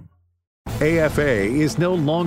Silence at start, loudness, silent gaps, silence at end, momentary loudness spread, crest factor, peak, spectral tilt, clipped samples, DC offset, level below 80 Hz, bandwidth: 0 s; -19 LUFS; 0.47-0.65 s; 0 s; 9 LU; 14 dB; -6 dBFS; -6.5 dB/octave; under 0.1%; under 0.1%; -38 dBFS; 16 kHz